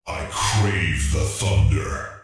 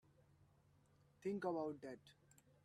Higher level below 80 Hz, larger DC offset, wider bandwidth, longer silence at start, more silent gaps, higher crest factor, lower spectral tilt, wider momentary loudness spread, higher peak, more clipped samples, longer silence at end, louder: first, -28 dBFS vs -86 dBFS; neither; about the same, 12 kHz vs 13 kHz; second, 0.05 s vs 1.2 s; neither; second, 14 dB vs 20 dB; second, -4.5 dB/octave vs -7 dB/octave; second, 6 LU vs 13 LU; first, -8 dBFS vs -30 dBFS; neither; second, 0.05 s vs 0.55 s; first, -22 LUFS vs -47 LUFS